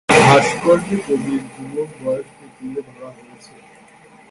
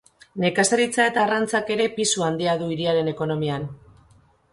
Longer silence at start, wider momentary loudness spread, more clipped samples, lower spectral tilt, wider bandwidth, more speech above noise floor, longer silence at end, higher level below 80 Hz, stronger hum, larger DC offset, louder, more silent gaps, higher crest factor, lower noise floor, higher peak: second, 0.1 s vs 0.35 s; first, 26 LU vs 7 LU; neither; about the same, -5 dB/octave vs -4 dB/octave; about the same, 11.5 kHz vs 11.5 kHz; second, 26 dB vs 35 dB; first, 1.2 s vs 0.75 s; first, -52 dBFS vs -60 dBFS; neither; neither; first, -17 LUFS vs -22 LUFS; neither; about the same, 18 dB vs 16 dB; second, -46 dBFS vs -57 dBFS; first, 0 dBFS vs -6 dBFS